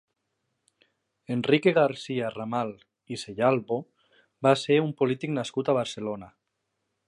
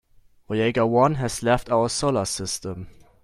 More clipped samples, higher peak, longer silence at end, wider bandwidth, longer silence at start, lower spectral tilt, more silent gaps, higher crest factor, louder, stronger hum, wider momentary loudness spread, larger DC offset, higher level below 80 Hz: neither; about the same, -8 dBFS vs -6 dBFS; first, 0.8 s vs 0.3 s; second, 11.5 kHz vs 14.5 kHz; first, 1.3 s vs 0.5 s; about the same, -6 dB/octave vs -5 dB/octave; neither; about the same, 20 dB vs 18 dB; second, -26 LUFS vs -23 LUFS; neither; first, 13 LU vs 10 LU; neither; second, -70 dBFS vs -46 dBFS